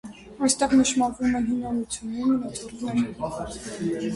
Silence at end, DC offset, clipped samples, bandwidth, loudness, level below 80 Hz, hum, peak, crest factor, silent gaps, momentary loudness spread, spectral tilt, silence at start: 0 s; under 0.1%; under 0.1%; 11.5 kHz; -25 LUFS; -50 dBFS; none; -8 dBFS; 18 dB; none; 13 LU; -4 dB/octave; 0.05 s